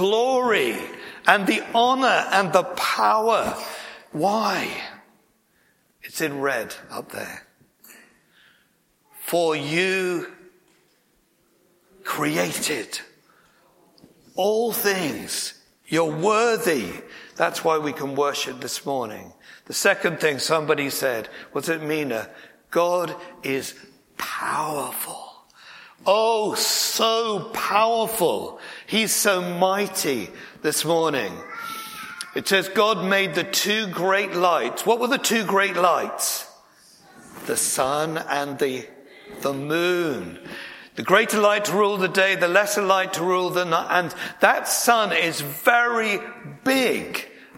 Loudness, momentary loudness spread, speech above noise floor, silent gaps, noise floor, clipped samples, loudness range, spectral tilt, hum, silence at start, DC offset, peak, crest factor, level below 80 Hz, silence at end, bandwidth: -22 LUFS; 15 LU; 42 dB; none; -64 dBFS; under 0.1%; 8 LU; -3 dB/octave; none; 0 s; under 0.1%; 0 dBFS; 24 dB; -68 dBFS; 0 s; 16.5 kHz